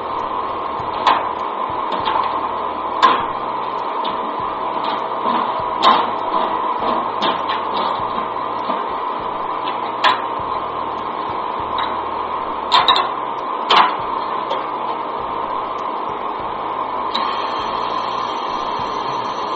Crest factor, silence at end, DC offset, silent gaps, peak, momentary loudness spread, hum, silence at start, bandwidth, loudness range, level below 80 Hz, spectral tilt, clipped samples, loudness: 20 dB; 0 s; under 0.1%; none; 0 dBFS; 8 LU; none; 0 s; 8 kHz; 4 LU; -52 dBFS; -0.5 dB/octave; under 0.1%; -20 LUFS